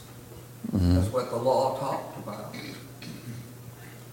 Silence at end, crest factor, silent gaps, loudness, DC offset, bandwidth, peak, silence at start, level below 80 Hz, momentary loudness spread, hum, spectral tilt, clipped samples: 0 s; 18 dB; none; -28 LUFS; under 0.1%; 17 kHz; -12 dBFS; 0 s; -48 dBFS; 20 LU; none; -7 dB/octave; under 0.1%